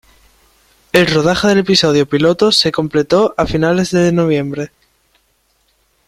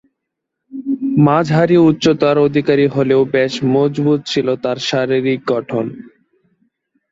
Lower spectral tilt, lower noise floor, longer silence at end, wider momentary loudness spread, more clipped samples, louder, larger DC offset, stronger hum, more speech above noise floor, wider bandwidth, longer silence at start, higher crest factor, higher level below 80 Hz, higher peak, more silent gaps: second, -5 dB/octave vs -6.5 dB/octave; second, -60 dBFS vs -78 dBFS; first, 1.4 s vs 1.05 s; second, 6 LU vs 9 LU; neither; about the same, -13 LUFS vs -15 LUFS; neither; neither; second, 47 dB vs 64 dB; first, 15 kHz vs 7.8 kHz; first, 0.95 s vs 0.7 s; about the same, 14 dB vs 14 dB; first, -42 dBFS vs -56 dBFS; about the same, 0 dBFS vs -2 dBFS; neither